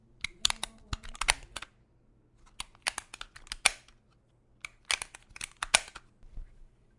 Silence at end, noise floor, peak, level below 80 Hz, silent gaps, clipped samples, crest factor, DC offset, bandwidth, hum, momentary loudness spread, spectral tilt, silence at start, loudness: 0.35 s; -66 dBFS; -2 dBFS; -50 dBFS; none; under 0.1%; 36 dB; under 0.1%; 11.5 kHz; none; 22 LU; 0.5 dB/octave; 0.25 s; -31 LUFS